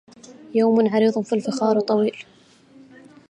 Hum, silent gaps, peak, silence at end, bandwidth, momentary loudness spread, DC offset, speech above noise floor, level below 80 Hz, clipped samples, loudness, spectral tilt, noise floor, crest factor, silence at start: none; none; -6 dBFS; 1.1 s; 9.4 kHz; 8 LU; under 0.1%; 31 dB; -74 dBFS; under 0.1%; -20 LUFS; -6.5 dB/octave; -50 dBFS; 16 dB; 0.3 s